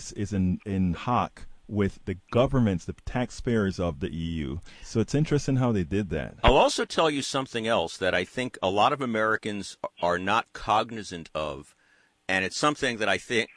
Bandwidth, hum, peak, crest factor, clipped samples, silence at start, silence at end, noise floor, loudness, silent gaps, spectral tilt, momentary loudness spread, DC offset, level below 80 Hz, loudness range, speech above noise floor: 10.5 kHz; none; -6 dBFS; 20 dB; under 0.1%; 0 s; 0.1 s; -64 dBFS; -27 LUFS; none; -5 dB/octave; 10 LU; under 0.1%; -42 dBFS; 3 LU; 37 dB